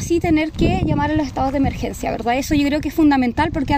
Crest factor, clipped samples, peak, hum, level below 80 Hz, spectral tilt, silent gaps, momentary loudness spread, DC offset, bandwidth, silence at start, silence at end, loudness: 14 dB; under 0.1%; -4 dBFS; none; -32 dBFS; -6 dB/octave; none; 6 LU; under 0.1%; 16 kHz; 0 s; 0 s; -19 LUFS